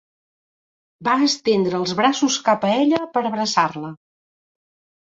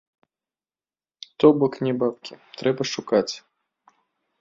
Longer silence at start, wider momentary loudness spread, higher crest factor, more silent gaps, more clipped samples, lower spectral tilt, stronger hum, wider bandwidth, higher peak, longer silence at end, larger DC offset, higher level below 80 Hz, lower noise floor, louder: second, 1 s vs 1.4 s; second, 5 LU vs 22 LU; about the same, 20 dB vs 22 dB; neither; neither; second, -4 dB/octave vs -5.5 dB/octave; neither; about the same, 8 kHz vs 7.6 kHz; about the same, -2 dBFS vs -4 dBFS; about the same, 1.1 s vs 1.05 s; neither; about the same, -66 dBFS vs -66 dBFS; about the same, under -90 dBFS vs under -90 dBFS; first, -19 LUFS vs -22 LUFS